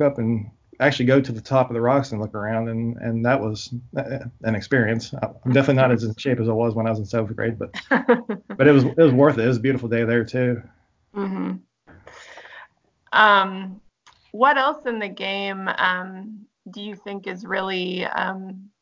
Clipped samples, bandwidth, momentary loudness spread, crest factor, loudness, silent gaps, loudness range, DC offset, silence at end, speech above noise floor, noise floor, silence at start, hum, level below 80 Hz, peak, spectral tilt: under 0.1%; 7.6 kHz; 18 LU; 20 dB; -21 LUFS; none; 7 LU; under 0.1%; 0.15 s; 35 dB; -56 dBFS; 0 s; none; -56 dBFS; 0 dBFS; -7 dB/octave